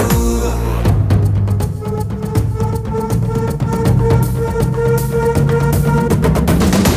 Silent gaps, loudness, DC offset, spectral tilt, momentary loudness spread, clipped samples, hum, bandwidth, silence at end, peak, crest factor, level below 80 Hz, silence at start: none; -15 LUFS; under 0.1%; -7 dB/octave; 5 LU; under 0.1%; none; 16 kHz; 0 s; -2 dBFS; 12 dB; -22 dBFS; 0 s